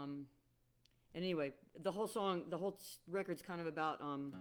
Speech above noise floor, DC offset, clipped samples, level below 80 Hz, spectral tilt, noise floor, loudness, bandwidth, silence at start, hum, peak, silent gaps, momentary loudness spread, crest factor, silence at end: 34 dB; under 0.1%; under 0.1%; -80 dBFS; -5.5 dB/octave; -77 dBFS; -43 LUFS; over 20 kHz; 0 s; none; -26 dBFS; none; 10 LU; 18 dB; 0 s